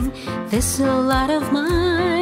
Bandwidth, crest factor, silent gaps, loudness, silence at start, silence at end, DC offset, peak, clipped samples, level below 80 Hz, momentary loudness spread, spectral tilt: 16 kHz; 14 dB; none; -19 LUFS; 0 s; 0 s; under 0.1%; -6 dBFS; under 0.1%; -32 dBFS; 6 LU; -4.5 dB/octave